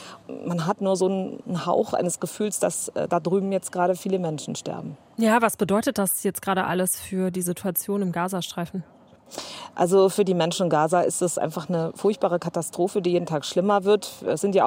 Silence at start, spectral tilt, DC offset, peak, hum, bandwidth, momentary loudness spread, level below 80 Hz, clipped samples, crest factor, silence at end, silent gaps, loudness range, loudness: 0 s; -5 dB/octave; under 0.1%; -6 dBFS; none; 16 kHz; 11 LU; -68 dBFS; under 0.1%; 18 dB; 0 s; none; 3 LU; -24 LUFS